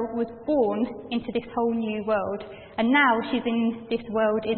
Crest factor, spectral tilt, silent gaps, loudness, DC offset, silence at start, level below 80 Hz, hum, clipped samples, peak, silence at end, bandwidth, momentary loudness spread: 18 dB; -10 dB/octave; none; -25 LUFS; under 0.1%; 0 s; -58 dBFS; none; under 0.1%; -8 dBFS; 0 s; 4.4 kHz; 11 LU